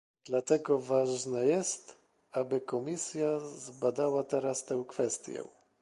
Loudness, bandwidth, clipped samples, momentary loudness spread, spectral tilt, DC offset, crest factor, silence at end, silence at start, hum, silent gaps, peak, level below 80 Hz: -32 LUFS; 11.5 kHz; under 0.1%; 10 LU; -4.5 dB/octave; under 0.1%; 18 dB; 0.35 s; 0.25 s; none; none; -14 dBFS; -78 dBFS